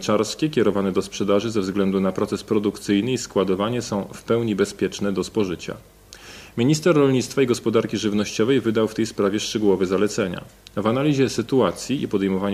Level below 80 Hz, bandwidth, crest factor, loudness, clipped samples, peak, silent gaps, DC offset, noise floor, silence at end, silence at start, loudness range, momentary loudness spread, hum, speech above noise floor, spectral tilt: -54 dBFS; 15.5 kHz; 16 dB; -22 LUFS; under 0.1%; -6 dBFS; none; under 0.1%; -42 dBFS; 0 s; 0 s; 3 LU; 7 LU; none; 21 dB; -5.5 dB/octave